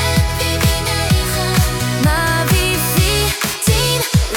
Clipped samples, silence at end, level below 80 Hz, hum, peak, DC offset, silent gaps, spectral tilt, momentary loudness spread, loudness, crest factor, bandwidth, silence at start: under 0.1%; 0 s; -24 dBFS; none; -2 dBFS; under 0.1%; none; -4 dB/octave; 3 LU; -15 LUFS; 14 dB; 18 kHz; 0 s